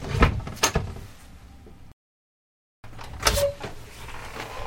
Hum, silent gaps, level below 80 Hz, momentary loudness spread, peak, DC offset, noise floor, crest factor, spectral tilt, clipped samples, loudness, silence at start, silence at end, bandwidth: none; 1.93-2.83 s; -36 dBFS; 23 LU; -2 dBFS; under 0.1%; under -90 dBFS; 28 dB; -3.5 dB/octave; under 0.1%; -26 LUFS; 0 s; 0 s; 16.5 kHz